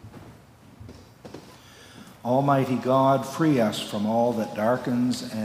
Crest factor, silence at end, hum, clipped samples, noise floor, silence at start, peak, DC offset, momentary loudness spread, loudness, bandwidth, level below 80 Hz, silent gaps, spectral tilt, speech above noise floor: 18 dB; 0 s; none; under 0.1%; -50 dBFS; 0.05 s; -8 dBFS; under 0.1%; 23 LU; -24 LUFS; 16 kHz; -62 dBFS; none; -6.5 dB/octave; 27 dB